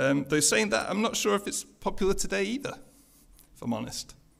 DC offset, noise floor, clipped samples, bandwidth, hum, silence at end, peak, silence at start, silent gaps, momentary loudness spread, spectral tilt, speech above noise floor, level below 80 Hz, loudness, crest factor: under 0.1%; -57 dBFS; under 0.1%; 16 kHz; none; 0.3 s; -10 dBFS; 0 s; none; 15 LU; -3 dB/octave; 29 dB; -46 dBFS; -28 LUFS; 18 dB